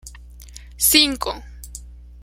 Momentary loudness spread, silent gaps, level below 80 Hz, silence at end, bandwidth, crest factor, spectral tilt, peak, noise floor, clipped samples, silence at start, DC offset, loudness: 24 LU; none; -40 dBFS; 0 s; 16.5 kHz; 24 dB; -1 dB/octave; 0 dBFS; -40 dBFS; under 0.1%; 0.05 s; under 0.1%; -16 LUFS